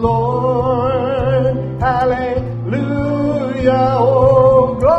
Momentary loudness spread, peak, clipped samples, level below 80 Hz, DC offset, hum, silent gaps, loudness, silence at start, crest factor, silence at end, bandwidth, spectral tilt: 8 LU; -2 dBFS; under 0.1%; -34 dBFS; under 0.1%; none; none; -15 LUFS; 0 s; 12 dB; 0 s; 8 kHz; -9 dB/octave